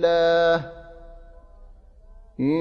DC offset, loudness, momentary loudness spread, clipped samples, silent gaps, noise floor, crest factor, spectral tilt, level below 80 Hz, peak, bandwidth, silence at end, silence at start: under 0.1%; -21 LUFS; 26 LU; under 0.1%; none; -47 dBFS; 16 dB; -6.5 dB/octave; -46 dBFS; -8 dBFS; 7 kHz; 0 s; 0 s